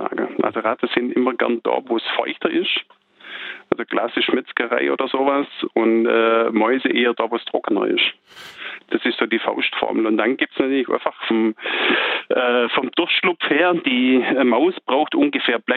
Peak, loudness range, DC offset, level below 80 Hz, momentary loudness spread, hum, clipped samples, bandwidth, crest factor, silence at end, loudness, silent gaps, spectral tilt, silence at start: -2 dBFS; 4 LU; under 0.1%; -68 dBFS; 6 LU; none; under 0.1%; 4.9 kHz; 18 dB; 0 s; -19 LUFS; none; -6.5 dB/octave; 0 s